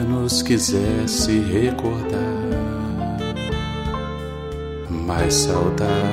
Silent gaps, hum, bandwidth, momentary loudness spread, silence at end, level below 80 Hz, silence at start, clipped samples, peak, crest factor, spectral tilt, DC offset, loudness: none; none; 16 kHz; 10 LU; 0 s; -34 dBFS; 0 s; under 0.1%; -4 dBFS; 16 dB; -4.5 dB/octave; under 0.1%; -21 LUFS